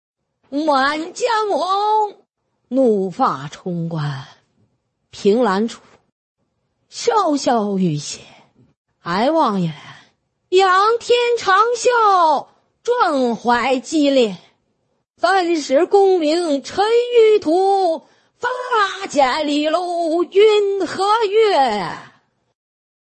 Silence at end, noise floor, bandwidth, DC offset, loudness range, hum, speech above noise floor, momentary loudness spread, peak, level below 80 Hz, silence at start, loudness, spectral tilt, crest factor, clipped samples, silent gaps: 1.05 s; -69 dBFS; 8.8 kHz; under 0.1%; 6 LU; none; 53 dB; 12 LU; -2 dBFS; -62 dBFS; 0.5 s; -17 LUFS; -4.5 dB/octave; 16 dB; under 0.1%; 6.12-6.35 s, 8.77-8.85 s